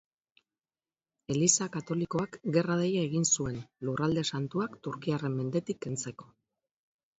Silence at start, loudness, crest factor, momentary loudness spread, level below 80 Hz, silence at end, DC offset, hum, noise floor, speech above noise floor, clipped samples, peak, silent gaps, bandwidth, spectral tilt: 1.3 s; -31 LUFS; 24 dB; 11 LU; -64 dBFS; 0.95 s; under 0.1%; none; under -90 dBFS; over 59 dB; under 0.1%; -8 dBFS; none; 8.2 kHz; -4.5 dB/octave